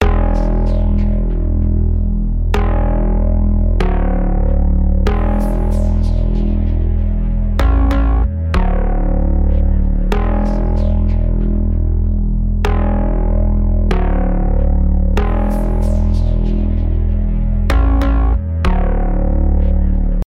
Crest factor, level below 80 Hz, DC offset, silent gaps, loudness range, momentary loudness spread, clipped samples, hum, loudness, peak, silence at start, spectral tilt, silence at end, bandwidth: 12 dB; -14 dBFS; under 0.1%; none; 1 LU; 3 LU; under 0.1%; none; -17 LUFS; 0 dBFS; 0 s; -8.5 dB/octave; 0.05 s; 5.6 kHz